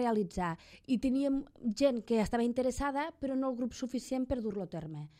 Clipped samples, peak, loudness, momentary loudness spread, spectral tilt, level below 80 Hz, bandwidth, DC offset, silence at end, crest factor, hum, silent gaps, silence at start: under 0.1%; -16 dBFS; -34 LUFS; 8 LU; -6 dB/octave; -54 dBFS; 14.5 kHz; under 0.1%; 0.1 s; 18 dB; none; none; 0 s